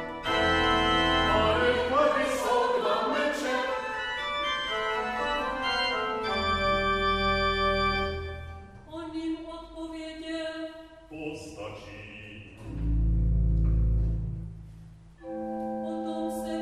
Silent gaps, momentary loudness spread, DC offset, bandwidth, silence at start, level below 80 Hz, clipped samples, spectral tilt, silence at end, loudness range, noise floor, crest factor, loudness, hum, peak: none; 18 LU; under 0.1%; 13 kHz; 0 s; -36 dBFS; under 0.1%; -5 dB/octave; 0 s; 13 LU; -49 dBFS; 16 dB; -28 LUFS; none; -12 dBFS